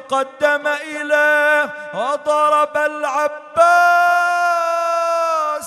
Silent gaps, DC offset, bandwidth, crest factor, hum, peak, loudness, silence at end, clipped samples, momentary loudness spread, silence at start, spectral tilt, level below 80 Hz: none; under 0.1%; 13.5 kHz; 16 dB; none; -2 dBFS; -16 LUFS; 0 s; under 0.1%; 9 LU; 0 s; -2 dB/octave; -68 dBFS